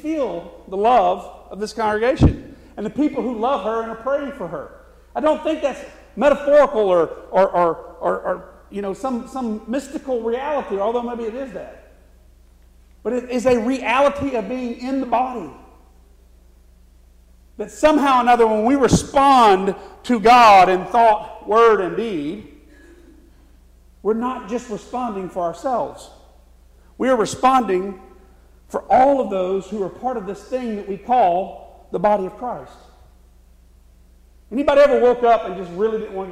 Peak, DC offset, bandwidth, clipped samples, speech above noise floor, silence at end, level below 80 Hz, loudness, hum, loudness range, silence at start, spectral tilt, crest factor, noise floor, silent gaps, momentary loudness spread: -4 dBFS; under 0.1%; 15 kHz; under 0.1%; 31 dB; 0 s; -42 dBFS; -18 LUFS; none; 12 LU; 0.05 s; -5.5 dB/octave; 16 dB; -49 dBFS; none; 16 LU